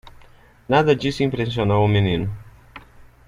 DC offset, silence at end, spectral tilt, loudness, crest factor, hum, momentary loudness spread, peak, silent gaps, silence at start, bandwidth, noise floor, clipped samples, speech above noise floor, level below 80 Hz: under 0.1%; 0.25 s; -7 dB/octave; -20 LUFS; 18 dB; none; 8 LU; -2 dBFS; none; 0.05 s; 10.5 kHz; -48 dBFS; under 0.1%; 30 dB; -44 dBFS